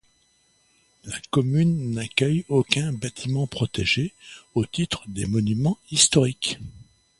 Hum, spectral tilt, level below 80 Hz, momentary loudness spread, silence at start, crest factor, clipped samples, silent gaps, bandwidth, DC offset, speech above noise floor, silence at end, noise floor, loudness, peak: none; -4 dB/octave; -50 dBFS; 12 LU; 1.05 s; 24 dB; under 0.1%; none; 11.5 kHz; under 0.1%; 40 dB; 0.4 s; -64 dBFS; -23 LUFS; 0 dBFS